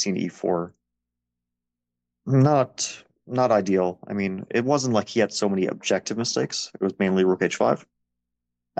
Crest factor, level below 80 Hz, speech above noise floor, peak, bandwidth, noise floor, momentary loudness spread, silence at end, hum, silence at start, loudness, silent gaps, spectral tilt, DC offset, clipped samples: 18 dB; -68 dBFS; 62 dB; -6 dBFS; 9 kHz; -85 dBFS; 9 LU; 0.95 s; 60 Hz at -55 dBFS; 0 s; -24 LUFS; none; -5 dB/octave; under 0.1%; under 0.1%